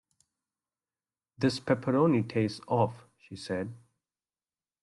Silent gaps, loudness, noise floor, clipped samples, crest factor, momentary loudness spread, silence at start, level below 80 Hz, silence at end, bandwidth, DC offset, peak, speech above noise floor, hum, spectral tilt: none; -29 LUFS; under -90 dBFS; under 0.1%; 20 dB; 14 LU; 1.4 s; -68 dBFS; 1.05 s; 11.5 kHz; under 0.1%; -12 dBFS; over 62 dB; none; -7 dB/octave